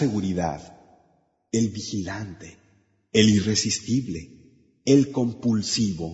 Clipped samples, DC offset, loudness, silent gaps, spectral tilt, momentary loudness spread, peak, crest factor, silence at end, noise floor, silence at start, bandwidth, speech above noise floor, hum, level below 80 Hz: under 0.1%; under 0.1%; -24 LUFS; none; -5 dB/octave; 16 LU; -4 dBFS; 20 dB; 0 s; -65 dBFS; 0 s; 8 kHz; 42 dB; none; -54 dBFS